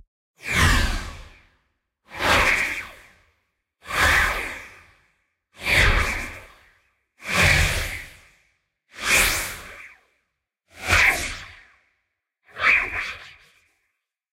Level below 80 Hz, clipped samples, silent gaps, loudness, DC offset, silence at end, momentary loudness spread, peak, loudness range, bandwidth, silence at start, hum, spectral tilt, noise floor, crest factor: -34 dBFS; under 0.1%; none; -20 LUFS; under 0.1%; 1.05 s; 21 LU; -4 dBFS; 3 LU; 16 kHz; 0.45 s; none; -2.5 dB/octave; -77 dBFS; 20 dB